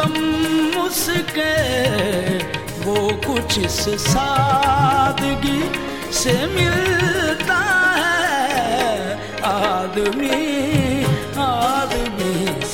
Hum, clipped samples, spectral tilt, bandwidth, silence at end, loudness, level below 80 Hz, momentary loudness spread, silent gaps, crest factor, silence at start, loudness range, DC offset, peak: none; under 0.1%; -4 dB/octave; 17 kHz; 0 s; -18 LUFS; -38 dBFS; 6 LU; none; 16 dB; 0 s; 2 LU; 0.7%; -4 dBFS